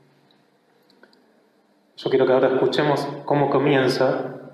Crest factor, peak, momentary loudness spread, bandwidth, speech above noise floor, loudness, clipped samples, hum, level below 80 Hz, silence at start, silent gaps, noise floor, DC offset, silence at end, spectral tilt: 16 dB; -6 dBFS; 7 LU; 13 kHz; 41 dB; -20 LUFS; under 0.1%; none; -68 dBFS; 2 s; none; -61 dBFS; under 0.1%; 0.05 s; -6.5 dB/octave